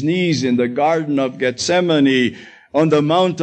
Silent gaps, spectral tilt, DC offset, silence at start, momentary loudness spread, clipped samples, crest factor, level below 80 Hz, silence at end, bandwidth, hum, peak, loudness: none; -5.5 dB/octave; under 0.1%; 0 s; 6 LU; under 0.1%; 12 dB; -62 dBFS; 0 s; 9 kHz; none; -4 dBFS; -17 LUFS